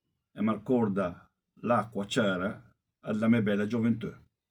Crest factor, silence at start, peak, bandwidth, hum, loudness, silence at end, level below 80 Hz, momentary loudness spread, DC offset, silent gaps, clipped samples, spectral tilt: 18 dB; 0.35 s; -12 dBFS; 11.5 kHz; none; -30 LUFS; 0.35 s; -68 dBFS; 11 LU; under 0.1%; none; under 0.1%; -6.5 dB/octave